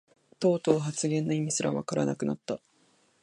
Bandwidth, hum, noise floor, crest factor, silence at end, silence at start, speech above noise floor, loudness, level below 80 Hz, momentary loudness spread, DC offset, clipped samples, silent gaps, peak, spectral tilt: 11.5 kHz; none; -66 dBFS; 22 dB; 0.65 s; 0.4 s; 38 dB; -29 LUFS; -68 dBFS; 8 LU; under 0.1%; under 0.1%; none; -8 dBFS; -5.5 dB/octave